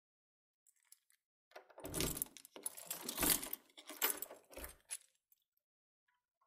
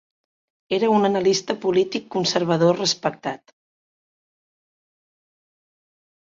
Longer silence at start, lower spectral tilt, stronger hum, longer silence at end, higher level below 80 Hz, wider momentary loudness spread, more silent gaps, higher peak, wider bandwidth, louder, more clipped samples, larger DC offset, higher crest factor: first, 1.55 s vs 0.7 s; second, -1.5 dB/octave vs -4.5 dB/octave; neither; second, 1.5 s vs 3 s; about the same, -64 dBFS vs -66 dBFS; first, 18 LU vs 9 LU; neither; second, -14 dBFS vs -4 dBFS; first, 16 kHz vs 7.8 kHz; second, -40 LUFS vs -21 LUFS; neither; neither; first, 32 dB vs 20 dB